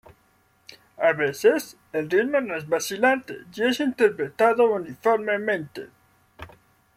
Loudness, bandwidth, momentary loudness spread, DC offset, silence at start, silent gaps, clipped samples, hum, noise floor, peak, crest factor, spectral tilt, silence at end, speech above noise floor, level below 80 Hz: -23 LUFS; 15.5 kHz; 8 LU; under 0.1%; 0.7 s; none; under 0.1%; none; -63 dBFS; -6 dBFS; 18 dB; -4 dB/octave; 0.5 s; 40 dB; -66 dBFS